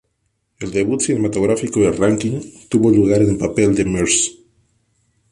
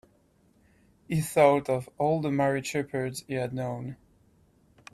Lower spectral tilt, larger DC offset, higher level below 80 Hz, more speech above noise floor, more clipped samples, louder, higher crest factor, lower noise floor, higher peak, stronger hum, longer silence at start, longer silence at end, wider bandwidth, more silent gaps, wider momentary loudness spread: about the same, -5 dB/octave vs -6 dB/octave; neither; first, -42 dBFS vs -62 dBFS; first, 53 dB vs 37 dB; neither; first, -17 LUFS vs -28 LUFS; second, 14 dB vs 22 dB; first, -69 dBFS vs -64 dBFS; first, -2 dBFS vs -6 dBFS; neither; second, 0.6 s vs 1.1 s; about the same, 1 s vs 1 s; second, 11.5 kHz vs 14.5 kHz; neither; second, 9 LU vs 12 LU